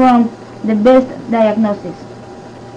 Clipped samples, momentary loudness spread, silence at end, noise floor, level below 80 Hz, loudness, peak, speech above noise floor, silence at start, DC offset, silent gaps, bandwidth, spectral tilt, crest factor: under 0.1%; 23 LU; 0 s; -32 dBFS; -48 dBFS; -13 LUFS; -2 dBFS; 20 dB; 0 s; under 0.1%; none; 9 kHz; -7.5 dB/octave; 12 dB